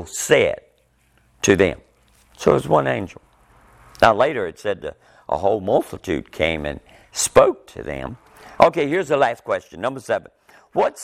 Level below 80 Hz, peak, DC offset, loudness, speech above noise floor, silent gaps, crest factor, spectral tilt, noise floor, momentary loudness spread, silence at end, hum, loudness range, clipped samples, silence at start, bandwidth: -48 dBFS; 0 dBFS; under 0.1%; -20 LUFS; 40 dB; none; 20 dB; -4 dB/octave; -60 dBFS; 16 LU; 0 s; none; 2 LU; under 0.1%; 0 s; 16.5 kHz